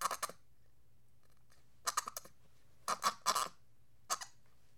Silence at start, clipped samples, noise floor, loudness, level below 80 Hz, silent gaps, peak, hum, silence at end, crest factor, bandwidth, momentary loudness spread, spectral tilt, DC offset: 0 s; under 0.1%; -72 dBFS; -39 LUFS; -76 dBFS; none; -16 dBFS; none; 0.5 s; 26 dB; 17.5 kHz; 12 LU; 0.5 dB/octave; 0.1%